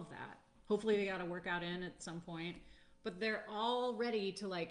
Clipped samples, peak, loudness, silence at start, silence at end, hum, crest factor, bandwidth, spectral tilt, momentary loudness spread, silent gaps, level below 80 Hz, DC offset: under 0.1%; -24 dBFS; -40 LUFS; 0 s; 0 s; none; 16 dB; 10 kHz; -5 dB/octave; 13 LU; none; -70 dBFS; under 0.1%